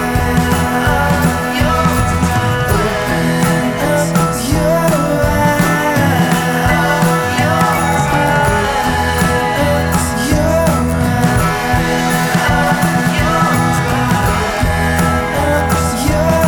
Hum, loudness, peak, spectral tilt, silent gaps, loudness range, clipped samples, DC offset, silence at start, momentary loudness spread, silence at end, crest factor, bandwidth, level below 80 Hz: none; -13 LUFS; 0 dBFS; -5 dB/octave; none; 1 LU; under 0.1%; under 0.1%; 0 s; 2 LU; 0 s; 12 dB; over 20 kHz; -26 dBFS